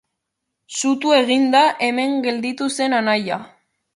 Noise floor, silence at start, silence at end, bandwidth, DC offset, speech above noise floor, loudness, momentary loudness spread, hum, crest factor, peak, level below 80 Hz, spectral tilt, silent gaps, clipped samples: -78 dBFS; 0.7 s; 0.5 s; 11.5 kHz; under 0.1%; 60 dB; -18 LUFS; 8 LU; none; 18 dB; -2 dBFS; -70 dBFS; -3 dB/octave; none; under 0.1%